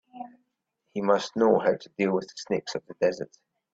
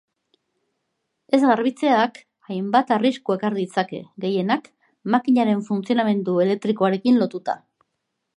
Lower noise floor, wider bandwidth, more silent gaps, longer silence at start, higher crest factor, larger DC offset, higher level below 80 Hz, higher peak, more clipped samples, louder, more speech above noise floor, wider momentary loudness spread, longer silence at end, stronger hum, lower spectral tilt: about the same, -78 dBFS vs -77 dBFS; second, 8 kHz vs 11 kHz; neither; second, 0.15 s vs 1.3 s; about the same, 20 dB vs 18 dB; neither; about the same, -70 dBFS vs -74 dBFS; second, -8 dBFS vs -4 dBFS; neither; second, -27 LUFS vs -21 LUFS; second, 52 dB vs 57 dB; first, 19 LU vs 11 LU; second, 0.5 s vs 0.8 s; neither; second, -5.5 dB/octave vs -7 dB/octave